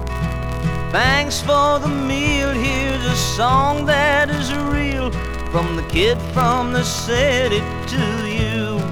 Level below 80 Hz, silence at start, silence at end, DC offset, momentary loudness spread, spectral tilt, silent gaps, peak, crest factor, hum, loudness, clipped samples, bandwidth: -28 dBFS; 0 s; 0 s; under 0.1%; 7 LU; -4.5 dB/octave; none; -2 dBFS; 16 dB; none; -18 LUFS; under 0.1%; 19 kHz